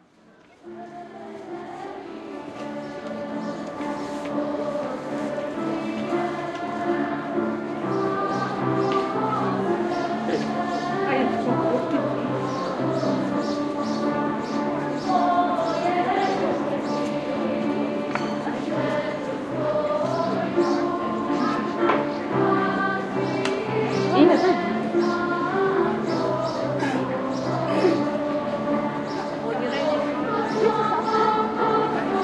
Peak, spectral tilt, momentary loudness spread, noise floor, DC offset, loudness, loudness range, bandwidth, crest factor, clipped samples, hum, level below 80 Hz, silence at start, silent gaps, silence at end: -4 dBFS; -6.5 dB/octave; 9 LU; -54 dBFS; under 0.1%; -24 LUFS; 7 LU; 11 kHz; 20 dB; under 0.1%; none; -62 dBFS; 0.65 s; none; 0 s